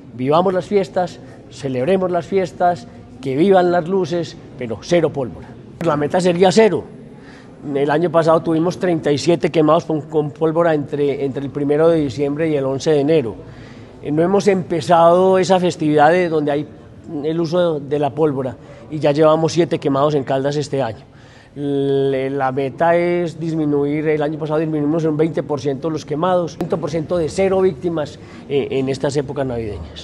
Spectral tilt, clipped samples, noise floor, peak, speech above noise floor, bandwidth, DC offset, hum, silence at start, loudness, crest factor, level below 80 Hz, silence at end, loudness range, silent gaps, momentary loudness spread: -6.5 dB/octave; under 0.1%; -39 dBFS; 0 dBFS; 22 dB; 11.5 kHz; under 0.1%; none; 0 s; -17 LUFS; 18 dB; -50 dBFS; 0 s; 4 LU; none; 14 LU